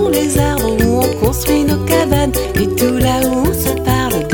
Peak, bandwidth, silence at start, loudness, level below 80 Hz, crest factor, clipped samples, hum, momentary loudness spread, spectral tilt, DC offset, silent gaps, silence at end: 0 dBFS; 19.5 kHz; 0 s; -14 LUFS; -24 dBFS; 14 dB; under 0.1%; none; 2 LU; -5 dB/octave; under 0.1%; none; 0 s